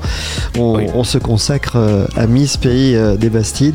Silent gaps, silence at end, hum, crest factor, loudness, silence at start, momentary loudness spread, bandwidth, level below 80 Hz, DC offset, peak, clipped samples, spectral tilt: none; 0 s; none; 12 dB; -14 LUFS; 0 s; 4 LU; 16 kHz; -26 dBFS; 0.7%; -2 dBFS; under 0.1%; -5.5 dB/octave